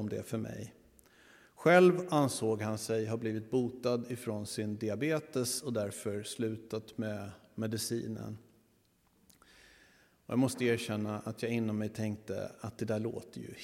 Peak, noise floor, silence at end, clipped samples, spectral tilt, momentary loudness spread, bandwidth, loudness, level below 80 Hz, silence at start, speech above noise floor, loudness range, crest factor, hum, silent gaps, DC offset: -12 dBFS; -70 dBFS; 0 s; under 0.1%; -5.5 dB/octave; 11 LU; 16.5 kHz; -34 LUFS; -72 dBFS; 0 s; 37 dB; 9 LU; 22 dB; none; none; under 0.1%